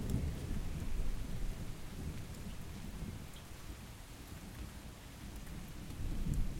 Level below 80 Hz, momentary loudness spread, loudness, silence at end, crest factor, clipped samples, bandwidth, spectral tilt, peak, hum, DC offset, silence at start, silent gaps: -44 dBFS; 10 LU; -46 LUFS; 0 s; 18 dB; under 0.1%; 16.5 kHz; -5.5 dB/octave; -22 dBFS; none; under 0.1%; 0 s; none